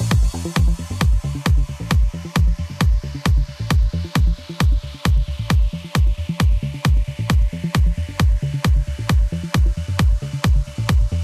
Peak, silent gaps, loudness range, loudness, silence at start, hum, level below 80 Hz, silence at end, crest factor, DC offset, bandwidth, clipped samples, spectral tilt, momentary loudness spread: -6 dBFS; none; 1 LU; -20 LUFS; 0 s; none; -20 dBFS; 0 s; 12 dB; under 0.1%; 14 kHz; under 0.1%; -6 dB/octave; 2 LU